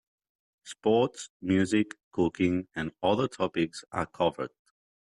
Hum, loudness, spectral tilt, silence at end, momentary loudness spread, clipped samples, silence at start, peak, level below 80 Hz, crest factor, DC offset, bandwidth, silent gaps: none; -29 LUFS; -6 dB/octave; 0.55 s; 11 LU; under 0.1%; 0.65 s; -14 dBFS; -64 dBFS; 16 dB; under 0.1%; 11.5 kHz; 1.30-1.40 s, 2.04-2.11 s